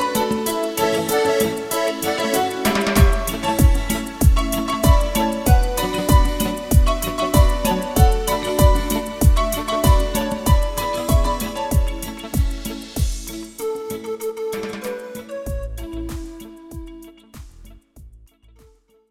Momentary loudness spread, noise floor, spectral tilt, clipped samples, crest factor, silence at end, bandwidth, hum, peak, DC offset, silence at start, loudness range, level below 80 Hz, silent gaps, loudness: 13 LU; -53 dBFS; -5 dB/octave; under 0.1%; 18 dB; 0.95 s; 17 kHz; none; -2 dBFS; under 0.1%; 0 s; 13 LU; -22 dBFS; none; -20 LUFS